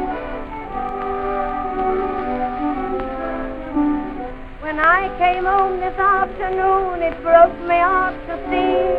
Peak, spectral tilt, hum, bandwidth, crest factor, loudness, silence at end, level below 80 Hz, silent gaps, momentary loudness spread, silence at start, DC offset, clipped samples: 0 dBFS; -7.5 dB/octave; none; 5.2 kHz; 18 dB; -19 LUFS; 0 s; -36 dBFS; none; 12 LU; 0 s; under 0.1%; under 0.1%